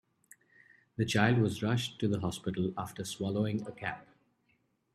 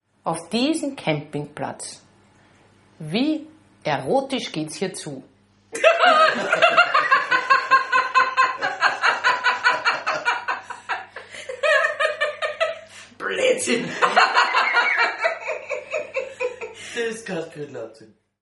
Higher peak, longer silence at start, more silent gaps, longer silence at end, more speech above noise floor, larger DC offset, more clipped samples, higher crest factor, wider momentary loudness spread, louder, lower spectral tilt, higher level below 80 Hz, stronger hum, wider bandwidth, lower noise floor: second, -10 dBFS vs -2 dBFS; first, 1 s vs 0.25 s; neither; first, 0.9 s vs 0.35 s; first, 43 dB vs 33 dB; neither; neither; about the same, 24 dB vs 20 dB; second, 12 LU vs 16 LU; second, -33 LUFS vs -21 LUFS; first, -5.5 dB/octave vs -3 dB/octave; first, -64 dBFS vs -70 dBFS; neither; first, 14 kHz vs 11.5 kHz; first, -74 dBFS vs -55 dBFS